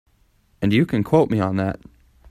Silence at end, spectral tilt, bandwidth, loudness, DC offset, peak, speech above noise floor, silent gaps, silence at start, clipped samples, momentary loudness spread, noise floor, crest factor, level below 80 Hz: 0.6 s; -8 dB/octave; 14.5 kHz; -20 LUFS; under 0.1%; -2 dBFS; 41 dB; none; 0.6 s; under 0.1%; 9 LU; -60 dBFS; 18 dB; -48 dBFS